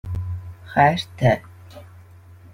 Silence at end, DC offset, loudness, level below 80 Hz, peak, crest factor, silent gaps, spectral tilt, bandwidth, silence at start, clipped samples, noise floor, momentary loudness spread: 0.55 s; under 0.1%; -21 LUFS; -46 dBFS; -2 dBFS; 22 dB; none; -6.5 dB/octave; 15.5 kHz; 0.05 s; under 0.1%; -45 dBFS; 14 LU